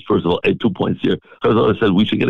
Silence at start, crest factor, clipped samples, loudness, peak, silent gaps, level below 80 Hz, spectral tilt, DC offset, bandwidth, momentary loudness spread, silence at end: 0.05 s; 10 dB; under 0.1%; -17 LUFS; -6 dBFS; none; -44 dBFS; -8.5 dB/octave; under 0.1%; 6.8 kHz; 5 LU; 0 s